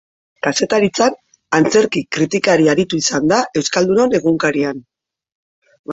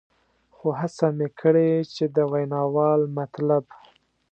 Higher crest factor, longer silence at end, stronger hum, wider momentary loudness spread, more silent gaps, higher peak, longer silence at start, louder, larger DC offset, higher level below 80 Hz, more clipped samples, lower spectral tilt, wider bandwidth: about the same, 16 dB vs 18 dB; second, 0 s vs 0.7 s; neither; about the same, 6 LU vs 7 LU; first, 5.35-5.62 s, 5.79-5.84 s vs none; first, 0 dBFS vs -6 dBFS; second, 0.45 s vs 0.65 s; first, -15 LUFS vs -23 LUFS; neither; first, -54 dBFS vs -72 dBFS; neither; second, -4 dB/octave vs -8.5 dB/octave; about the same, 8.2 kHz vs 8.4 kHz